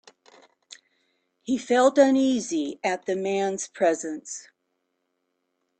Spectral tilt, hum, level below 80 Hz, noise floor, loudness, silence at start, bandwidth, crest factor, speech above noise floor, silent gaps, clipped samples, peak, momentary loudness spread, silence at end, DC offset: -4 dB/octave; none; -72 dBFS; -77 dBFS; -24 LUFS; 0.7 s; 9 kHz; 20 dB; 53 dB; none; under 0.1%; -6 dBFS; 16 LU; 1.4 s; under 0.1%